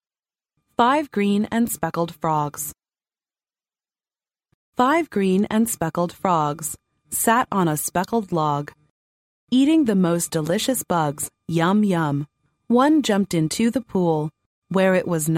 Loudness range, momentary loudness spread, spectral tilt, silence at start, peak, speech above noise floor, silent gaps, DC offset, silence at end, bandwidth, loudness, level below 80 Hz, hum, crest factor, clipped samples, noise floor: 5 LU; 10 LU; -5 dB/octave; 0.8 s; -4 dBFS; over 70 dB; 4.54-4.73 s, 8.90-9.47 s, 14.46-14.62 s; under 0.1%; 0 s; 16.5 kHz; -21 LUFS; -58 dBFS; none; 18 dB; under 0.1%; under -90 dBFS